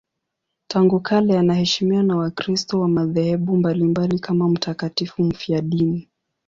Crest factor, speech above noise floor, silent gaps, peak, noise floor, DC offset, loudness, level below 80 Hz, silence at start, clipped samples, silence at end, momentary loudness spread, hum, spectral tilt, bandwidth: 14 dB; 60 dB; none; -4 dBFS; -79 dBFS; under 0.1%; -20 LUFS; -54 dBFS; 0.7 s; under 0.1%; 0.45 s; 6 LU; none; -6.5 dB/octave; 7.6 kHz